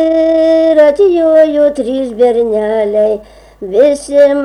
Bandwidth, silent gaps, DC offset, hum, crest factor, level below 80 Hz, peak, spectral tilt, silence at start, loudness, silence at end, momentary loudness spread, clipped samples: 11 kHz; none; under 0.1%; none; 10 dB; -44 dBFS; 0 dBFS; -5 dB/octave; 0 s; -10 LUFS; 0 s; 8 LU; under 0.1%